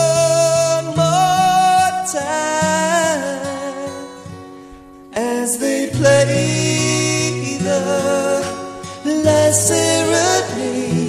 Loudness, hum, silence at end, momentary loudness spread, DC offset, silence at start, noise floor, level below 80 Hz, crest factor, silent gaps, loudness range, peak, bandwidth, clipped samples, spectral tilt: -16 LUFS; none; 0 s; 13 LU; under 0.1%; 0 s; -39 dBFS; -52 dBFS; 16 dB; none; 5 LU; 0 dBFS; 14 kHz; under 0.1%; -4 dB/octave